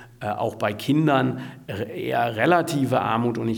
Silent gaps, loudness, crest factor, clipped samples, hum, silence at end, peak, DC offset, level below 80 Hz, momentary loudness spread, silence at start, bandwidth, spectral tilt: none; -23 LUFS; 18 dB; under 0.1%; none; 0 s; -4 dBFS; under 0.1%; -60 dBFS; 11 LU; 0 s; 19 kHz; -6.5 dB/octave